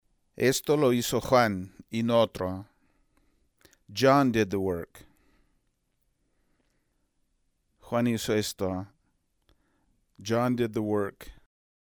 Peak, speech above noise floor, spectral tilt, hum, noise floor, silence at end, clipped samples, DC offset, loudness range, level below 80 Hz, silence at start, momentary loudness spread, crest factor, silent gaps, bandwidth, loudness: -8 dBFS; 48 dB; -5 dB/octave; none; -74 dBFS; 0.5 s; under 0.1%; under 0.1%; 8 LU; -58 dBFS; 0.4 s; 14 LU; 22 dB; none; over 20 kHz; -27 LUFS